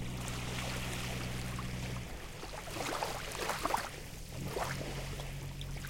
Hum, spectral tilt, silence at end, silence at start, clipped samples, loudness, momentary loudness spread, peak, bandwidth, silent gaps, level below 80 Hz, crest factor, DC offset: none; -4 dB/octave; 0 s; 0 s; under 0.1%; -39 LUFS; 8 LU; -18 dBFS; 17 kHz; none; -48 dBFS; 22 dB; under 0.1%